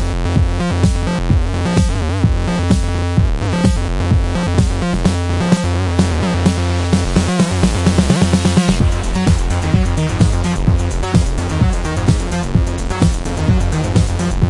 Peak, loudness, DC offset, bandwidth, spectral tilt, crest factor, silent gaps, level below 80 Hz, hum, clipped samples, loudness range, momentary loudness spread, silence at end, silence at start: 0 dBFS; -16 LUFS; under 0.1%; 11.5 kHz; -6 dB/octave; 14 dB; none; -20 dBFS; none; under 0.1%; 2 LU; 4 LU; 0 s; 0 s